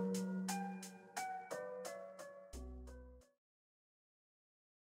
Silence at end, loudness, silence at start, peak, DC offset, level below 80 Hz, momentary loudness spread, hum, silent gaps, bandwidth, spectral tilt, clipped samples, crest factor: 1.75 s; -47 LUFS; 0 s; -30 dBFS; under 0.1%; -62 dBFS; 15 LU; none; none; 16 kHz; -5 dB/octave; under 0.1%; 18 dB